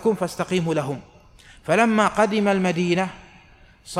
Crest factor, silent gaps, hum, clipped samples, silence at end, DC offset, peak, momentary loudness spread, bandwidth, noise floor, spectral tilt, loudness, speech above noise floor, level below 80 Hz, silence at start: 18 dB; none; none; under 0.1%; 0 s; under 0.1%; -4 dBFS; 12 LU; 14.5 kHz; -51 dBFS; -5.5 dB/octave; -21 LUFS; 30 dB; -54 dBFS; 0 s